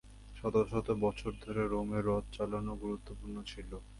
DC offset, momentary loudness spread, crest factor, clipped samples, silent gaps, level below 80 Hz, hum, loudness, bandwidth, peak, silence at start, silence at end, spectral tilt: under 0.1%; 12 LU; 18 dB; under 0.1%; none; -48 dBFS; none; -36 LUFS; 11.5 kHz; -18 dBFS; 0.05 s; 0 s; -7.5 dB/octave